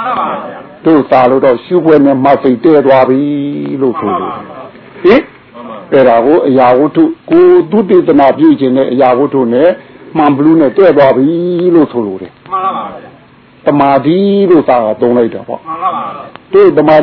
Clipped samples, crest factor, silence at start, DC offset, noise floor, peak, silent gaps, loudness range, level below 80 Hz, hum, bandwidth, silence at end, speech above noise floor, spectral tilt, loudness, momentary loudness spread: 2%; 8 dB; 0 s; under 0.1%; -40 dBFS; 0 dBFS; none; 4 LU; -50 dBFS; none; 5.4 kHz; 0 s; 32 dB; -10 dB/octave; -8 LUFS; 14 LU